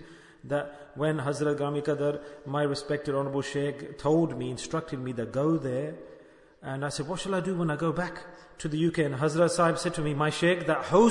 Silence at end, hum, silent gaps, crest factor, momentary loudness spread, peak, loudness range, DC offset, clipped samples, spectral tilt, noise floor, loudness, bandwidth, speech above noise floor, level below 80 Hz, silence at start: 0 s; none; none; 20 dB; 11 LU; -8 dBFS; 4 LU; under 0.1%; under 0.1%; -6 dB/octave; -53 dBFS; -29 LUFS; 11 kHz; 25 dB; -58 dBFS; 0 s